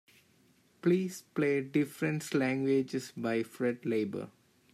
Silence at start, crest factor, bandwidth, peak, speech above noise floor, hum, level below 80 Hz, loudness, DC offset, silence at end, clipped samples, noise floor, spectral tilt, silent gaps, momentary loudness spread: 0.85 s; 16 dB; 15 kHz; -16 dBFS; 35 dB; none; -78 dBFS; -32 LUFS; under 0.1%; 0.45 s; under 0.1%; -67 dBFS; -6.5 dB/octave; none; 7 LU